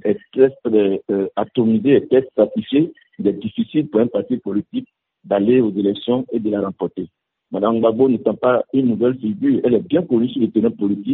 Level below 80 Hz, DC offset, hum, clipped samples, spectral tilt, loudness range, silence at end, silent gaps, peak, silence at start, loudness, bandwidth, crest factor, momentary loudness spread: -60 dBFS; under 0.1%; none; under 0.1%; -7 dB/octave; 3 LU; 0 s; none; -2 dBFS; 0.05 s; -18 LUFS; 4.1 kHz; 16 dB; 8 LU